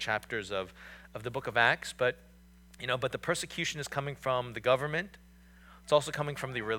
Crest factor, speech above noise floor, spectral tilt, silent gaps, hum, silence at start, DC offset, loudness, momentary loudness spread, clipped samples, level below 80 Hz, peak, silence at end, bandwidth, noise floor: 24 dB; 24 dB; -4 dB/octave; none; none; 0 s; under 0.1%; -32 LUFS; 16 LU; under 0.1%; -60 dBFS; -10 dBFS; 0 s; 18.5 kHz; -57 dBFS